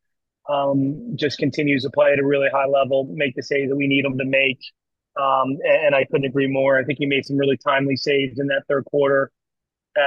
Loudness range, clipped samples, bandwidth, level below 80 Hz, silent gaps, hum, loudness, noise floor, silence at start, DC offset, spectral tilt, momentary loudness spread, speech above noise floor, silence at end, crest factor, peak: 1 LU; under 0.1%; 7.2 kHz; -66 dBFS; none; none; -20 LUFS; -84 dBFS; 0.45 s; under 0.1%; -6.5 dB/octave; 6 LU; 64 dB; 0 s; 16 dB; -4 dBFS